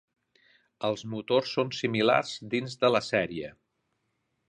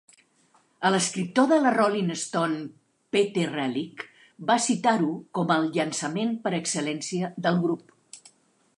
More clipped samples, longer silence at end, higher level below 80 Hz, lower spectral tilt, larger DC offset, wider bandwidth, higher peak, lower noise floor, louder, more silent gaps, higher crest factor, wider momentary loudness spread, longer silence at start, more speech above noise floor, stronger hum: neither; first, 0.95 s vs 0.6 s; first, -68 dBFS vs -76 dBFS; about the same, -5 dB/octave vs -4.5 dB/octave; neither; second, 10 kHz vs 11.5 kHz; about the same, -8 dBFS vs -8 dBFS; first, -78 dBFS vs -64 dBFS; second, -28 LUFS vs -25 LUFS; neither; about the same, 22 dB vs 18 dB; about the same, 10 LU vs 11 LU; about the same, 0.8 s vs 0.8 s; first, 50 dB vs 39 dB; neither